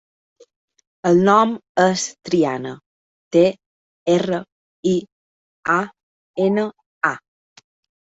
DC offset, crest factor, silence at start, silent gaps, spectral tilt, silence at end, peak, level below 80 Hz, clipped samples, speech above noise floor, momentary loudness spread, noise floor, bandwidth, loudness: under 0.1%; 18 dB; 1.05 s; 1.69-1.75 s, 2.86-3.31 s, 3.66-4.06 s, 4.52-4.83 s, 5.12-5.63 s, 6.03-6.34 s, 6.86-7.01 s; -5.5 dB/octave; 0.85 s; -2 dBFS; -62 dBFS; under 0.1%; over 73 dB; 14 LU; under -90 dBFS; 8 kHz; -19 LUFS